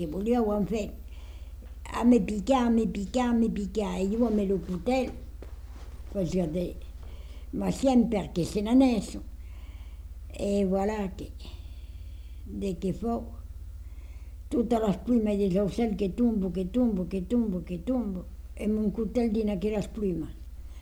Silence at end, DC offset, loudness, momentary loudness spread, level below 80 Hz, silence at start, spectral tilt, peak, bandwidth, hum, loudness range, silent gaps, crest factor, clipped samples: 0 s; under 0.1%; -28 LUFS; 20 LU; -42 dBFS; 0 s; -7 dB/octave; -12 dBFS; 14 kHz; none; 6 LU; none; 16 dB; under 0.1%